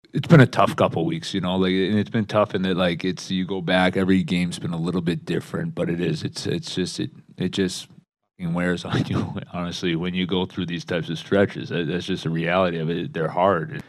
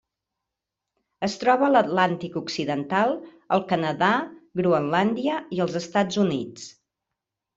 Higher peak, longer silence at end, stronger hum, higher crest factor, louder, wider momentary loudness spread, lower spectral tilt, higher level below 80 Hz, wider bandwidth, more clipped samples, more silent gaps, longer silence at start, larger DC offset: about the same, -2 dBFS vs -4 dBFS; second, 0.1 s vs 0.85 s; neither; about the same, 20 dB vs 20 dB; about the same, -23 LUFS vs -24 LUFS; second, 8 LU vs 11 LU; about the same, -6.5 dB/octave vs -5.5 dB/octave; first, -56 dBFS vs -66 dBFS; first, 12.5 kHz vs 8 kHz; neither; neither; second, 0.15 s vs 1.2 s; neither